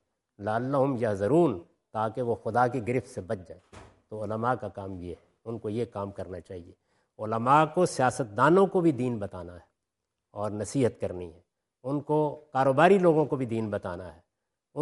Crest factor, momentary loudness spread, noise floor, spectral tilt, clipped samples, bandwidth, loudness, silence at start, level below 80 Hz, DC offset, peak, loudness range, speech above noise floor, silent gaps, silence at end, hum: 22 dB; 19 LU; -85 dBFS; -7 dB/octave; under 0.1%; 11.5 kHz; -27 LUFS; 0.4 s; -66 dBFS; under 0.1%; -6 dBFS; 9 LU; 58 dB; none; 0 s; none